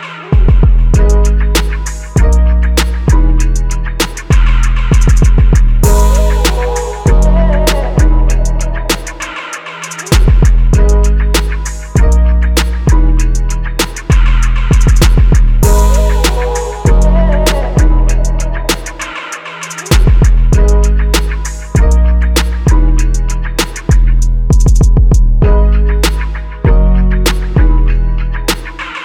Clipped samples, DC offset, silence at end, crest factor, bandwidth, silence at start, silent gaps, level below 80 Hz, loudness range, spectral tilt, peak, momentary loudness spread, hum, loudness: under 0.1%; under 0.1%; 0 s; 8 dB; 16 kHz; 0 s; none; -8 dBFS; 2 LU; -5.5 dB/octave; 0 dBFS; 8 LU; none; -12 LUFS